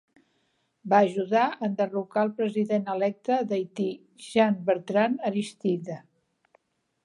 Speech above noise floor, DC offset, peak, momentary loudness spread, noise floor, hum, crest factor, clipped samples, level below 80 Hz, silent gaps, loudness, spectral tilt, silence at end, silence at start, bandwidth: 47 dB; under 0.1%; -8 dBFS; 9 LU; -72 dBFS; none; 20 dB; under 0.1%; -78 dBFS; none; -26 LUFS; -6.5 dB/octave; 1.05 s; 0.85 s; 11 kHz